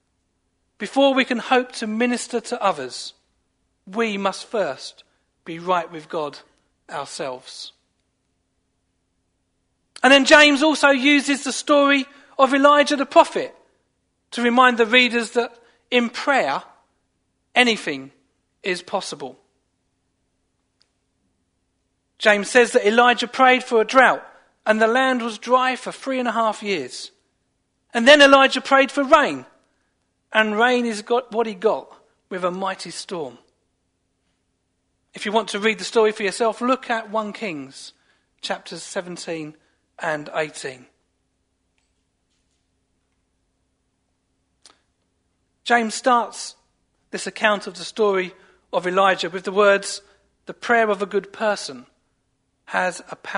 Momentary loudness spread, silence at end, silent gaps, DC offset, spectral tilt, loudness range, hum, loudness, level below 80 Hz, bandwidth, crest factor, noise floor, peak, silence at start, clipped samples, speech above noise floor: 18 LU; 0 s; none; under 0.1%; -3 dB/octave; 14 LU; none; -19 LUFS; -66 dBFS; 11 kHz; 22 dB; -71 dBFS; 0 dBFS; 0.8 s; under 0.1%; 52 dB